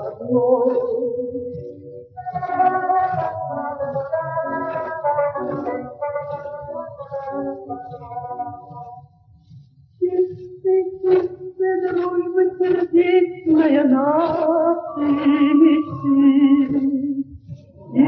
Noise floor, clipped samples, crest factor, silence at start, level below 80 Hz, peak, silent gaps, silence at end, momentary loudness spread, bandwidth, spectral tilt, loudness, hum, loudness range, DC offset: -49 dBFS; under 0.1%; 16 dB; 0 s; -56 dBFS; -4 dBFS; none; 0 s; 16 LU; 4.9 kHz; -10 dB/octave; -20 LUFS; none; 12 LU; under 0.1%